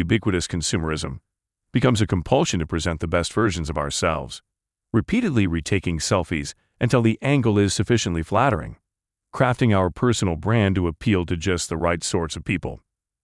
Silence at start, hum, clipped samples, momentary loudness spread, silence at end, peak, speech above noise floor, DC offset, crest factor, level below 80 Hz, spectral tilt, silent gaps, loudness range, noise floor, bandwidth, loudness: 0 s; none; under 0.1%; 9 LU; 0.45 s; -4 dBFS; 63 dB; under 0.1%; 18 dB; -42 dBFS; -5.5 dB/octave; none; 2 LU; -84 dBFS; 12 kHz; -22 LUFS